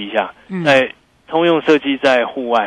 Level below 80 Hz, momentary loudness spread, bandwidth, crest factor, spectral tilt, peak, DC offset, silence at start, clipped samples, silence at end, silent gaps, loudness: -58 dBFS; 8 LU; 10.5 kHz; 14 dB; -5.5 dB/octave; -2 dBFS; under 0.1%; 0 s; under 0.1%; 0 s; none; -15 LUFS